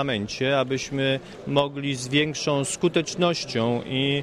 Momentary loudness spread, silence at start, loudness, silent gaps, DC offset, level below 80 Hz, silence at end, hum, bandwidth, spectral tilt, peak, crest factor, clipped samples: 4 LU; 0 s; -24 LUFS; none; under 0.1%; -56 dBFS; 0 s; none; 12.5 kHz; -4.5 dB/octave; -6 dBFS; 18 dB; under 0.1%